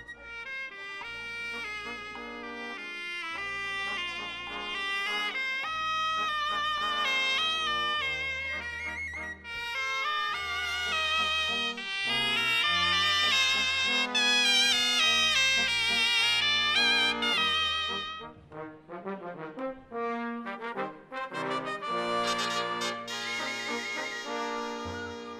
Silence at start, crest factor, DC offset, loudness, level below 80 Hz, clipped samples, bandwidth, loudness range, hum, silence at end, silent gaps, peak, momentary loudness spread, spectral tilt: 0 s; 18 dB; under 0.1%; -28 LUFS; -60 dBFS; under 0.1%; 15.5 kHz; 12 LU; none; 0 s; none; -12 dBFS; 15 LU; -1 dB/octave